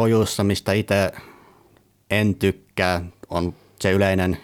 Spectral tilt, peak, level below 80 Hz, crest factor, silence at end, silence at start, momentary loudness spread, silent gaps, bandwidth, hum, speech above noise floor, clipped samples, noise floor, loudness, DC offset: -5.5 dB/octave; -4 dBFS; -48 dBFS; 18 dB; 0 s; 0 s; 8 LU; none; 17.5 kHz; none; 36 dB; under 0.1%; -57 dBFS; -22 LUFS; under 0.1%